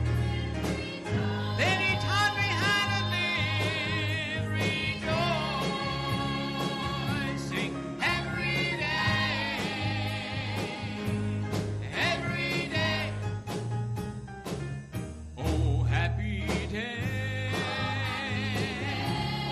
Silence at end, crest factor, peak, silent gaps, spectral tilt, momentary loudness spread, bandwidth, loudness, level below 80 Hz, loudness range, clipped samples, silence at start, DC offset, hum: 0 s; 14 dB; -16 dBFS; none; -5 dB/octave; 8 LU; 14 kHz; -29 LUFS; -44 dBFS; 5 LU; under 0.1%; 0 s; under 0.1%; none